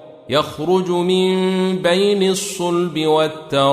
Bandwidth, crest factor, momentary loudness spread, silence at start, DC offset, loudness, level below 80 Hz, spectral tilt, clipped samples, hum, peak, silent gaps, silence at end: 15.5 kHz; 14 dB; 4 LU; 0 s; under 0.1%; -17 LUFS; -58 dBFS; -5 dB/octave; under 0.1%; none; -2 dBFS; none; 0 s